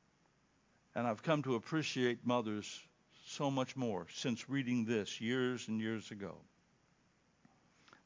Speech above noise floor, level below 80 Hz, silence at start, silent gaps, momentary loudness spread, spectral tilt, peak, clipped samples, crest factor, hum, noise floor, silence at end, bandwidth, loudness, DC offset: 36 dB; -78 dBFS; 0.95 s; none; 13 LU; -5.5 dB/octave; -18 dBFS; under 0.1%; 22 dB; none; -74 dBFS; 1.65 s; 7.6 kHz; -38 LUFS; under 0.1%